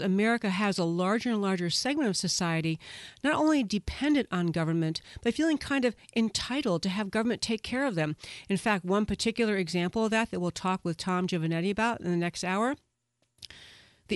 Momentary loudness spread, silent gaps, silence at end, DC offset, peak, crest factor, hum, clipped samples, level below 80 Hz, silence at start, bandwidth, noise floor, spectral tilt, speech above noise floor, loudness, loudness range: 5 LU; none; 0 s; under 0.1%; -14 dBFS; 16 dB; none; under 0.1%; -54 dBFS; 0 s; 11.5 kHz; -77 dBFS; -5 dB/octave; 48 dB; -29 LUFS; 2 LU